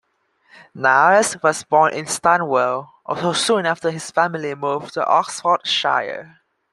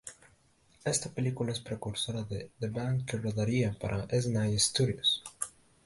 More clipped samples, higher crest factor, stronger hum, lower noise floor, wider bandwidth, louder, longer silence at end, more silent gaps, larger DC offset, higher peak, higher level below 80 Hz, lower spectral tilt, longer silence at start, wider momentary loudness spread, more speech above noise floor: neither; about the same, 18 dB vs 20 dB; neither; second, -61 dBFS vs -66 dBFS; first, 13 kHz vs 11.5 kHz; first, -18 LUFS vs -32 LUFS; about the same, 0.45 s vs 0.35 s; neither; neither; first, -2 dBFS vs -14 dBFS; second, -66 dBFS vs -56 dBFS; second, -3 dB/octave vs -4.5 dB/octave; first, 0.75 s vs 0.05 s; about the same, 9 LU vs 11 LU; first, 43 dB vs 34 dB